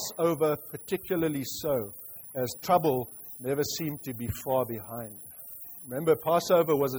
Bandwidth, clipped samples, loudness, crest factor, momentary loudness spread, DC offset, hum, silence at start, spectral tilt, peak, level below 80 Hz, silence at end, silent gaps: over 20 kHz; under 0.1%; -29 LUFS; 18 dB; 16 LU; under 0.1%; none; 0 s; -5 dB/octave; -12 dBFS; -60 dBFS; 0 s; none